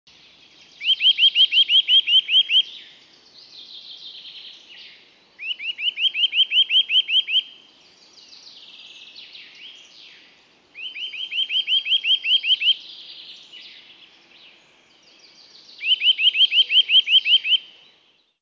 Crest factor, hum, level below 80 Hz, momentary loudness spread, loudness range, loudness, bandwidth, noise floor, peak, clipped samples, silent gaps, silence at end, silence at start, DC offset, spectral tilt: 16 dB; none; -82 dBFS; 24 LU; 14 LU; -16 LUFS; 7 kHz; -60 dBFS; -6 dBFS; under 0.1%; none; 0.8 s; 0.8 s; under 0.1%; 2.5 dB/octave